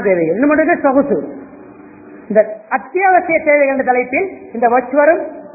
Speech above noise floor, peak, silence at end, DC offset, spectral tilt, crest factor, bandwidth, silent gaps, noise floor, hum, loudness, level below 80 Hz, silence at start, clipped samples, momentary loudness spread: 24 dB; 0 dBFS; 0.05 s; under 0.1%; -15 dB/octave; 14 dB; 2.7 kHz; none; -37 dBFS; none; -14 LUFS; -54 dBFS; 0 s; under 0.1%; 8 LU